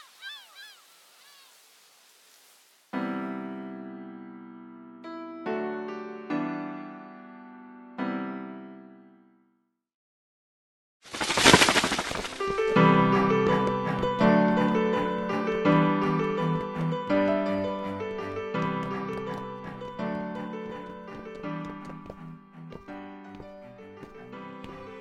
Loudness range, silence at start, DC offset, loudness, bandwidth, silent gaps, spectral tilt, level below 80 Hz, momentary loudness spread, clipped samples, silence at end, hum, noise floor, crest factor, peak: 18 LU; 0.2 s; under 0.1%; -26 LUFS; 12.5 kHz; 9.94-11.00 s; -4.5 dB/octave; -56 dBFS; 24 LU; under 0.1%; 0 s; none; -73 dBFS; 26 dB; -4 dBFS